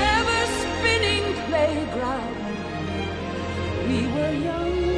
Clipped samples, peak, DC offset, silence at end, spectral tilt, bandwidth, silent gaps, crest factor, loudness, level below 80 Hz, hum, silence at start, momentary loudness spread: under 0.1%; -8 dBFS; under 0.1%; 0 s; -4.5 dB/octave; 11 kHz; none; 16 dB; -24 LUFS; -38 dBFS; none; 0 s; 9 LU